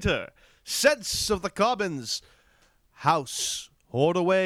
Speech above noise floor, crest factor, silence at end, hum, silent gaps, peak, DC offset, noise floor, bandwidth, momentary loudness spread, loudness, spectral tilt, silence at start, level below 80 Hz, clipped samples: 37 dB; 18 dB; 0 s; none; none; -8 dBFS; under 0.1%; -63 dBFS; 17 kHz; 11 LU; -26 LUFS; -3.5 dB/octave; 0 s; -48 dBFS; under 0.1%